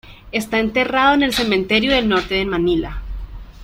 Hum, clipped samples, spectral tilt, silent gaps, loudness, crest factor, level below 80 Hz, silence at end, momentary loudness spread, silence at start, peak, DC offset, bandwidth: none; under 0.1%; -4.5 dB/octave; none; -17 LUFS; 16 dB; -34 dBFS; 0 s; 17 LU; 0.05 s; -2 dBFS; under 0.1%; 16.5 kHz